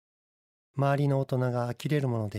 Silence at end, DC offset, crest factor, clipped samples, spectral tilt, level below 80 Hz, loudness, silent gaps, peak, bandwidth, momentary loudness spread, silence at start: 0 s; under 0.1%; 16 dB; under 0.1%; -8 dB/octave; -68 dBFS; -28 LUFS; none; -12 dBFS; 13.5 kHz; 5 LU; 0.75 s